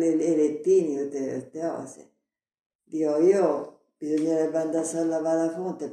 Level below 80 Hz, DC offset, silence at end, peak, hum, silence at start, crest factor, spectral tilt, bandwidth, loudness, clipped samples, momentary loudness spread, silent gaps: -80 dBFS; under 0.1%; 0 s; -10 dBFS; none; 0 s; 16 dB; -6.5 dB/octave; 11 kHz; -25 LUFS; under 0.1%; 12 LU; 2.66-2.79 s